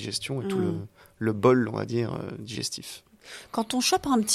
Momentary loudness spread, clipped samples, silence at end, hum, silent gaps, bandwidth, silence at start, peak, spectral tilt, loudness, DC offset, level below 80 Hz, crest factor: 20 LU; under 0.1%; 0 s; none; none; 14 kHz; 0 s; -6 dBFS; -4.5 dB/octave; -27 LUFS; under 0.1%; -60 dBFS; 20 dB